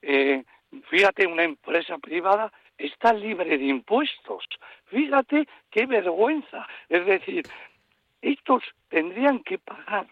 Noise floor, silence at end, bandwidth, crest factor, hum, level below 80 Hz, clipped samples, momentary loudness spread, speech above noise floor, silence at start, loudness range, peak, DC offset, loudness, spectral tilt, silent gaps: -67 dBFS; 0.05 s; 9 kHz; 18 dB; none; -72 dBFS; under 0.1%; 13 LU; 43 dB; 0.05 s; 3 LU; -8 dBFS; under 0.1%; -24 LUFS; -5 dB/octave; none